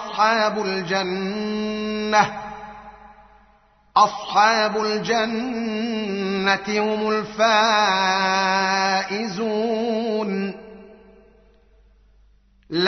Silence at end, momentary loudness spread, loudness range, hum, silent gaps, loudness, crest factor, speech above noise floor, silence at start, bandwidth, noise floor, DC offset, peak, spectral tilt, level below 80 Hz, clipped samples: 0 s; 9 LU; 6 LU; none; none; -21 LUFS; 20 dB; 36 dB; 0 s; 6.4 kHz; -57 dBFS; under 0.1%; -2 dBFS; -2 dB/octave; -58 dBFS; under 0.1%